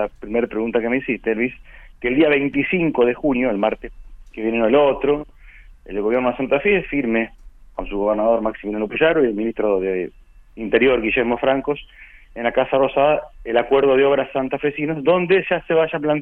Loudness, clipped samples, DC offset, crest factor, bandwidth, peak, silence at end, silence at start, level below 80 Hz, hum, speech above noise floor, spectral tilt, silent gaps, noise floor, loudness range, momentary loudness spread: -19 LUFS; under 0.1%; under 0.1%; 18 dB; 4.2 kHz; -2 dBFS; 0 s; 0 s; -44 dBFS; none; 25 dB; -8.5 dB/octave; none; -43 dBFS; 3 LU; 11 LU